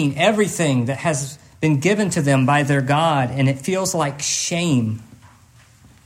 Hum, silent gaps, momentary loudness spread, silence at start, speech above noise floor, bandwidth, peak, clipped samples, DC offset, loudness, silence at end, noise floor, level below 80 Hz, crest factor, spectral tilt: none; none; 6 LU; 0 s; 31 dB; 16 kHz; -2 dBFS; under 0.1%; under 0.1%; -19 LUFS; 0.9 s; -50 dBFS; -58 dBFS; 16 dB; -5 dB/octave